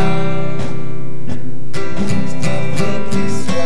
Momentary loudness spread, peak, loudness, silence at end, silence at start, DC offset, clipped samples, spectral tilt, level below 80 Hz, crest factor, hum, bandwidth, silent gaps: 8 LU; 0 dBFS; -22 LUFS; 0 s; 0 s; 40%; under 0.1%; -6 dB/octave; -40 dBFS; 14 dB; none; 11 kHz; none